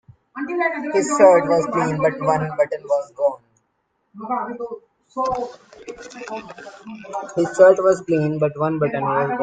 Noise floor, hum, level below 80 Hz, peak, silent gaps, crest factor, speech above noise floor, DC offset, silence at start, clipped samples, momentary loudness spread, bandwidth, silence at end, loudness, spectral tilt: -70 dBFS; none; -60 dBFS; 0 dBFS; none; 20 dB; 50 dB; under 0.1%; 0.35 s; under 0.1%; 24 LU; 9.2 kHz; 0 s; -19 LUFS; -6 dB/octave